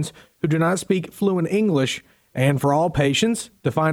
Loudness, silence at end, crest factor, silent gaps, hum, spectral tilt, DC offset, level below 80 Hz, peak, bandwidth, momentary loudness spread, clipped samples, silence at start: -21 LUFS; 0 s; 16 dB; none; none; -5.5 dB/octave; under 0.1%; -50 dBFS; -6 dBFS; 17 kHz; 8 LU; under 0.1%; 0 s